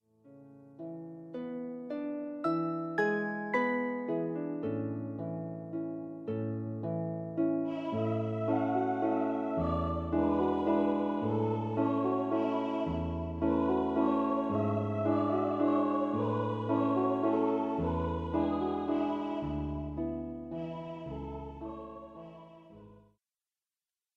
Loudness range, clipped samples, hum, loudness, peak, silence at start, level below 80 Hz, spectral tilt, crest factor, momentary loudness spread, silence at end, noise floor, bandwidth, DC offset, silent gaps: 7 LU; under 0.1%; none; -33 LUFS; -16 dBFS; 0.25 s; -52 dBFS; -9.5 dB/octave; 16 dB; 12 LU; 1.2 s; under -90 dBFS; 6.8 kHz; under 0.1%; none